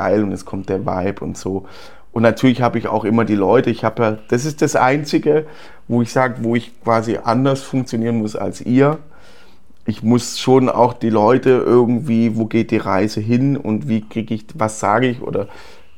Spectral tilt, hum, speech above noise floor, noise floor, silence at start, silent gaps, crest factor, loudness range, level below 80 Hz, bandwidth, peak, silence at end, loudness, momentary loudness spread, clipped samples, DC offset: -6.5 dB/octave; none; 32 dB; -49 dBFS; 0 s; none; 16 dB; 4 LU; -50 dBFS; 15.5 kHz; 0 dBFS; 0.35 s; -17 LUFS; 10 LU; under 0.1%; 2%